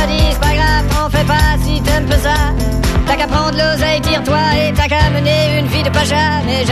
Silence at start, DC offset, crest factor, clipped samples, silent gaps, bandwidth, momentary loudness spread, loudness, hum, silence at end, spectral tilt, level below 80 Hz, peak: 0 s; 0.7%; 12 dB; under 0.1%; none; 14.5 kHz; 2 LU; -13 LUFS; none; 0 s; -5 dB/octave; -18 dBFS; 0 dBFS